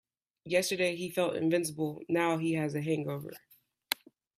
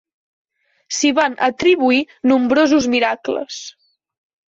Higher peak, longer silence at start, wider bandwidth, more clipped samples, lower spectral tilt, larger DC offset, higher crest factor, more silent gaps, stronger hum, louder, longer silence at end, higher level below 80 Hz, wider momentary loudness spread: second, -8 dBFS vs -4 dBFS; second, 0.45 s vs 0.9 s; first, 16 kHz vs 8 kHz; neither; first, -5 dB/octave vs -2.5 dB/octave; neither; first, 26 dB vs 14 dB; neither; neither; second, -32 LUFS vs -16 LUFS; second, 0.45 s vs 0.8 s; second, -74 dBFS vs -56 dBFS; second, 8 LU vs 12 LU